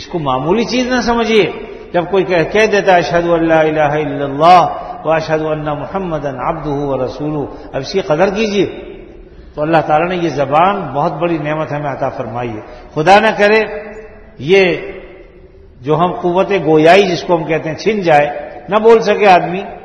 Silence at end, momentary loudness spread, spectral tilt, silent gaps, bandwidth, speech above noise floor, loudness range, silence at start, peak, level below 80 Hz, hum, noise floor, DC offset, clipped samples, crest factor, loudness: 0 s; 13 LU; -6 dB/octave; none; 10.5 kHz; 27 dB; 6 LU; 0 s; 0 dBFS; -40 dBFS; none; -39 dBFS; under 0.1%; 0.2%; 14 dB; -13 LUFS